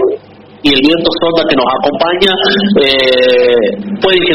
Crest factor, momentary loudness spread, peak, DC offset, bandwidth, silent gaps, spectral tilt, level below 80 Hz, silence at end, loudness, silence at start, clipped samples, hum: 10 dB; 6 LU; 0 dBFS; under 0.1%; 11.5 kHz; none; -5.5 dB/octave; -40 dBFS; 0 s; -10 LUFS; 0 s; 0.2%; none